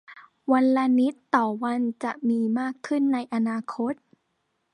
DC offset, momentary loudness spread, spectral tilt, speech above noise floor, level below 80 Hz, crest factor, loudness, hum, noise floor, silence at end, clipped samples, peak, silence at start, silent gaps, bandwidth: under 0.1%; 9 LU; -6.5 dB/octave; 51 dB; -78 dBFS; 20 dB; -25 LUFS; none; -75 dBFS; 0.8 s; under 0.1%; -4 dBFS; 0.1 s; none; 10 kHz